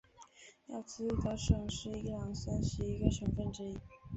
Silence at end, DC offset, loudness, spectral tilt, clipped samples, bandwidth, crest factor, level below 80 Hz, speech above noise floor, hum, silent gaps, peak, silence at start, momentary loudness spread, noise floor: 0 s; under 0.1%; -38 LUFS; -6.5 dB/octave; under 0.1%; 8.2 kHz; 24 dB; -44 dBFS; 23 dB; none; none; -14 dBFS; 0.2 s; 14 LU; -59 dBFS